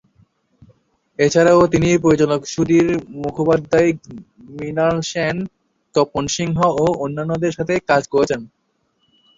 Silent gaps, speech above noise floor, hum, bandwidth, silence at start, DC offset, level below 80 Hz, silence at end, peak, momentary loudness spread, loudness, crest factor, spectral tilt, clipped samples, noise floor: none; 49 dB; none; 7.8 kHz; 1.2 s; under 0.1%; -46 dBFS; 0.9 s; -2 dBFS; 12 LU; -17 LUFS; 16 dB; -5.5 dB/octave; under 0.1%; -66 dBFS